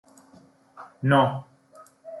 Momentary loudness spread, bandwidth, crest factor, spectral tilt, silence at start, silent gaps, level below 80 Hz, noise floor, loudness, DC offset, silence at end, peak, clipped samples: 27 LU; 11.5 kHz; 20 dB; -7.5 dB/octave; 0.8 s; none; -70 dBFS; -55 dBFS; -23 LUFS; under 0.1%; 0 s; -8 dBFS; under 0.1%